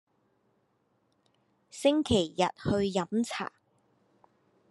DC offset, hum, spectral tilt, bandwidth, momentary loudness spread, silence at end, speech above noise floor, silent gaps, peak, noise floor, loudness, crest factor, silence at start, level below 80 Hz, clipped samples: under 0.1%; none; -5 dB/octave; 12 kHz; 11 LU; 1.25 s; 45 dB; none; -12 dBFS; -73 dBFS; -29 LUFS; 20 dB; 1.75 s; -58 dBFS; under 0.1%